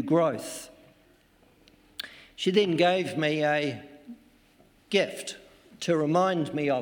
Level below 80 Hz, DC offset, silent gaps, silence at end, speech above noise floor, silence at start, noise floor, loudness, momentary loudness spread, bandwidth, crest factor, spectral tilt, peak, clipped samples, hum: -70 dBFS; under 0.1%; none; 0 s; 35 dB; 0 s; -61 dBFS; -27 LUFS; 19 LU; 17.5 kHz; 18 dB; -5 dB/octave; -10 dBFS; under 0.1%; none